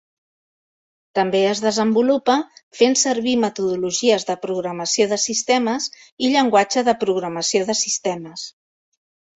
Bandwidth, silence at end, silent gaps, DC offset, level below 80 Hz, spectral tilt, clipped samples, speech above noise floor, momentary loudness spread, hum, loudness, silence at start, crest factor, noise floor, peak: 8.4 kHz; 0.9 s; 2.63-2.71 s, 6.12-6.17 s; under 0.1%; -66 dBFS; -3 dB/octave; under 0.1%; over 71 dB; 9 LU; none; -19 LUFS; 1.15 s; 18 dB; under -90 dBFS; -2 dBFS